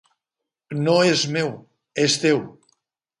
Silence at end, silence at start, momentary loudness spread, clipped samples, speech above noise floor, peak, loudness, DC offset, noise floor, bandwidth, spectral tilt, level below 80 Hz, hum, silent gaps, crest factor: 0.7 s; 0.7 s; 15 LU; under 0.1%; 65 dB; -4 dBFS; -20 LUFS; under 0.1%; -85 dBFS; 11 kHz; -4 dB/octave; -68 dBFS; none; none; 18 dB